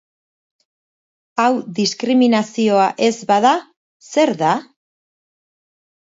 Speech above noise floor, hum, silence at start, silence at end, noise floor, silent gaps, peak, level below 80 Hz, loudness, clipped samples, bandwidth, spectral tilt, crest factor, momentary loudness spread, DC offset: over 74 dB; none; 1.35 s; 1.55 s; under -90 dBFS; 3.76-4.00 s; -2 dBFS; -70 dBFS; -17 LUFS; under 0.1%; 7.8 kHz; -4.5 dB/octave; 18 dB; 7 LU; under 0.1%